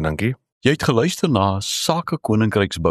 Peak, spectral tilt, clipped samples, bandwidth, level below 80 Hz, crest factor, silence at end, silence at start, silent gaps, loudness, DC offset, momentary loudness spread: -2 dBFS; -5 dB/octave; under 0.1%; 14 kHz; -42 dBFS; 18 dB; 0 s; 0 s; 0.52-0.61 s; -20 LUFS; under 0.1%; 4 LU